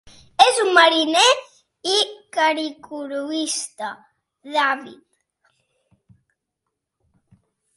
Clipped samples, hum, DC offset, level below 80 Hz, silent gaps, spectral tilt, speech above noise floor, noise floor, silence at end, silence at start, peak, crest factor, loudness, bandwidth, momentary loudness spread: under 0.1%; none; under 0.1%; -68 dBFS; none; 0 dB/octave; 61 dB; -80 dBFS; 2.8 s; 0.4 s; 0 dBFS; 22 dB; -18 LUFS; 11.5 kHz; 16 LU